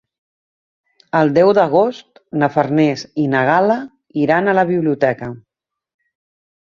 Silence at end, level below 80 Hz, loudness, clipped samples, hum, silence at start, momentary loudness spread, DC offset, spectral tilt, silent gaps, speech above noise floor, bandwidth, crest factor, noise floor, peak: 1.3 s; -58 dBFS; -16 LUFS; under 0.1%; none; 1.15 s; 9 LU; under 0.1%; -7.5 dB/octave; none; 68 dB; 7.2 kHz; 16 dB; -83 dBFS; 0 dBFS